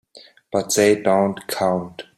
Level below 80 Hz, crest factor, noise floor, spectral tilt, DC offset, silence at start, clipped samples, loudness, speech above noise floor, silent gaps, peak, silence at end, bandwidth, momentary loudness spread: -62 dBFS; 18 dB; -48 dBFS; -4 dB/octave; under 0.1%; 0.15 s; under 0.1%; -20 LUFS; 29 dB; none; -4 dBFS; 0.15 s; 16 kHz; 10 LU